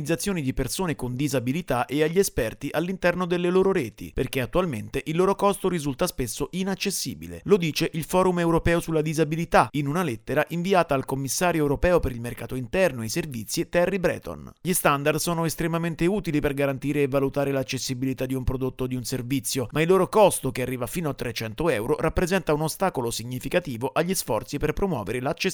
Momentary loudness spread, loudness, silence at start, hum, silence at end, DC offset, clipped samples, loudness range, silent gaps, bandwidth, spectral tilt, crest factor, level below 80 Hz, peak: 7 LU; -25 LUFS; 0 s; none; 0 s; under 0.1%; under 0.1%; 3 LU; none; over 20 kHz; -5 dB/octave; 20 dB; -42 dBFS; -6 dBFS